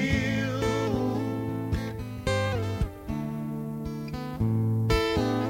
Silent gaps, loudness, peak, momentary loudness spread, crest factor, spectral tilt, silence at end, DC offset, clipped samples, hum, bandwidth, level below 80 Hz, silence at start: none; -29 LUFS; -12 dBFS; 9 LU; 16 dB; -6.5 dB/octave; 0 s; under 0.1%; under 0.1%; none; 16.5 kHz; -40 dBFS; 0 s